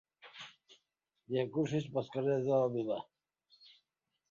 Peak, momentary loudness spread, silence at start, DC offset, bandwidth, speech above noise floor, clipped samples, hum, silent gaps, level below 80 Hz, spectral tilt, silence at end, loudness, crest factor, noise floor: -18 dBFS; 20 LU; 0.25 s; under 0.1%; 7.4 kHz; 51 dB; under 0.1%; none; none; -78 dBFS; -6.5 dB/octave; 1.3 s; -35 LUFS; 20 dB; -84 dBFS